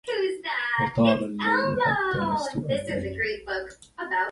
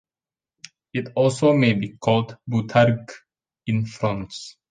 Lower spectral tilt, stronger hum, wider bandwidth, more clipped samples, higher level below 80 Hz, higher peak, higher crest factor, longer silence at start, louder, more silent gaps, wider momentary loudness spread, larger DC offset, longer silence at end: about the same, -6 dB/octave vs -6.5 dB/octave; neither; first, 11.5 kHz vs 9.4 kHz; neither; about the same, -52 dBFS vs -56 dBFS; second, -8 dBFS vs -4 dBFS; about the same, 18 dB vs 18 dB; second, 0.05 s vs 0.95 s; second, -26 LUFS vs -22 LUFS; neither; second, 9 LU vs 15 LU; neither; second, 0 s vs 0.2 s